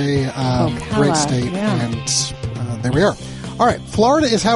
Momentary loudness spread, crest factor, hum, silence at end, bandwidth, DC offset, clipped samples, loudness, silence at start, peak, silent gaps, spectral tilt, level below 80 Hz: 8 LU; 16 dB; none; 0 s; 11.5 kHz; under 0.1%; under 0.1%; -18 LUFS; 0 s; -2 dBFS; none; -5 dB/octave; -38 dBFS